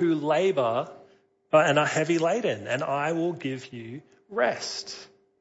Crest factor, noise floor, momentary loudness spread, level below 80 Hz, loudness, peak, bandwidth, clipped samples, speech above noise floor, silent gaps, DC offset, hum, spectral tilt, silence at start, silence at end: 18 dB; -60 dBFS; 17 LU; -74 dBFS; -26 LUFS; -8 dBFS; 8 kHz; under 0.1%; 34 dB; none; under 0.1%; none; -5 dB/octave; 0 s; 0.35 s